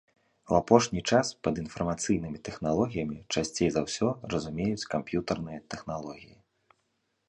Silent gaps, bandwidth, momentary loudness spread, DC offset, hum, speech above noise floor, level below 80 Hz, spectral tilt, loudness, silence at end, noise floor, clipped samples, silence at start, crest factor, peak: none; 11 kHz; 14 LU; under 0.1%; none; 48 dB; -54 dBFS; -5 dB/octave; -29 LUFS; 1.05 s; -77 dBFS; under 0.1%; 0.45 s; 26 dB; -4 dBFS